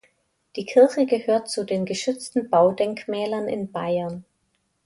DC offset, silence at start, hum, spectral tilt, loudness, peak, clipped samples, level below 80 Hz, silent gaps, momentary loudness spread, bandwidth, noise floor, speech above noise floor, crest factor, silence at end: under 0.1%; 0.55 s; none; -5 dB/octave; -23 LUFS; -4 dBFS; under 0.1%; -66 dBFS; none; 11 LU; 11.5 kHz; -71 dBFS; 49 dB; 18 dB; 0.65 s